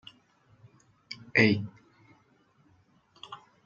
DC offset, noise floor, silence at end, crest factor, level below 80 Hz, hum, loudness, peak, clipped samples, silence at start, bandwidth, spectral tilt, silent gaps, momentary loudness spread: under 0.1%; -66 dBFS; 0.3 s; 26 dB; -72 dBFS; none; -25 LUFS; -6 dBFS; under 0.1%; 1.1 s; 7.4 kHz; -6.5 dB/octave; none; 24 LU